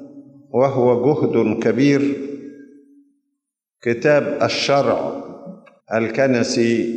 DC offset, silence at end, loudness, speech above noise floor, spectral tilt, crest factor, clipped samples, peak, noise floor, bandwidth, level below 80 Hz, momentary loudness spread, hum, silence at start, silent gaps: under 0.1%; 0 s; -18 LUFS; 62 dB; -5.5 dB/octave; 14 dB; under 0.1%; -4 dBFS; -79 dBFS; 9.2 kHz; -66 dBFS; 16 LU; none; 0 s; none